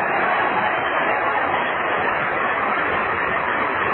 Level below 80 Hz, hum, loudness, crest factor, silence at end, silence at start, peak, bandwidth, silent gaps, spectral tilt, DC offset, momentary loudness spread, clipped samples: -52 dBFS; none; -20 LUFS; 14 dB; 0 s; 0 s; -6 dBFS; 4.2 kHz; none; -8 dB/octave; under 0.1%; 2 LU; under 0.1%